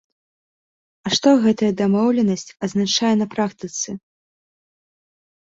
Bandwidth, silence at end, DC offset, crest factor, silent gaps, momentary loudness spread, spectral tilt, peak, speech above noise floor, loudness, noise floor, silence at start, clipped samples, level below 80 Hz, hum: 8 kHz; 1.6 s; under 0.1%; 18 dB; none; 11 LU; -4.5 dB/octave; -4 dBFS; over 71 dB; -19 LUFS; under -90 dBFS; 1.05 s; under 0.1%; -62 dBFS; none